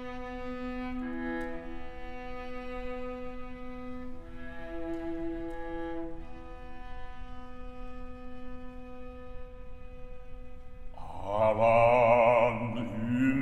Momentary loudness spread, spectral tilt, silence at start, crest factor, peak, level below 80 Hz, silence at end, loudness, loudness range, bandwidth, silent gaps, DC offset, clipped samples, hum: 25 LU; -8 dB/octave; 0 s; 20 dB; -12 dBFS; -46 dBFS; 0 s; -30 LUFS; 20 LU; 9 kHz; none; under 0.1%; under 0.1%; none